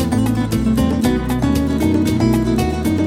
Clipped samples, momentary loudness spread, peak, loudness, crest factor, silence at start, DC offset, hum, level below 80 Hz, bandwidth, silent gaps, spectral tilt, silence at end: under 0.1%; 2 LU; -4 dBFS; -17 LUFS; 12 dB; 0 s; under 0.1%; none; -28 dBFS; 16.5 kHz; none; -6.5 dB/octave; 0 s